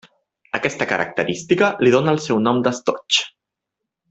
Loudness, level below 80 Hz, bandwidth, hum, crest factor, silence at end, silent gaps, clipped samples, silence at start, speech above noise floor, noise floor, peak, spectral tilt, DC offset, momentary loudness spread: -19 LUFS; -58 dBFS; 8.2 kHz; none; 18 dB; 0.85 s; none; under 0.1%; 0.55 s; 64 dB; -82 dBFS; -2 dBFS; -4.5 dB/octave; under 0.1%; 8 LU